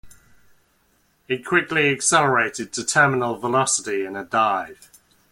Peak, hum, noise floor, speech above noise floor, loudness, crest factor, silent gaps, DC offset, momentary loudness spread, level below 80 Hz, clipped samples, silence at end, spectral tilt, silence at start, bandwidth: -4 dBFS; none; -63 dBFS; 42 dB; -20 LUFS; 20 dB; none; under 0.1%; 10 LU; -62 dBFS; under 0.1%; 0.55 s; -3 dB/octave; 0.05 s; 16.5 kHz